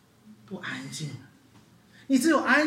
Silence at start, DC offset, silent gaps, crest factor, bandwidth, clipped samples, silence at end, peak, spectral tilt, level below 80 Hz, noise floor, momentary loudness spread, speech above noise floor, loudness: 0.25 s; under 0.1%; none; 18 dB; 16.5 kHz; under 0.1%; 0 s; -10 dBFS; -4 dB/octave; -74 dBFS; -57 dBFS; 20 LU; 32 dB; -27 LUFS